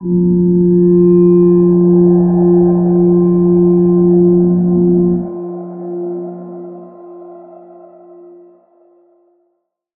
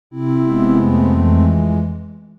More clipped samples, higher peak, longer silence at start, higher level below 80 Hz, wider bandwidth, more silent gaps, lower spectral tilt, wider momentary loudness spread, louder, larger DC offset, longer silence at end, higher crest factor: neither; about the same, -2 dBFS vs -2 dBFS; about the same, 0 s vs 0.1 s; second, -42 dBFS vs -36 dBFS; second, 1.8 kHz vs 4.7 kHz; neither; first, -16 dB/octave vs -11 dB/octave; first, 16 LU vs 8 LU; first, -10 LUFS vs -15 LUFS; neither; first, 2.55 s vs 0.1 s; about the same, 10 dB vs 12 dB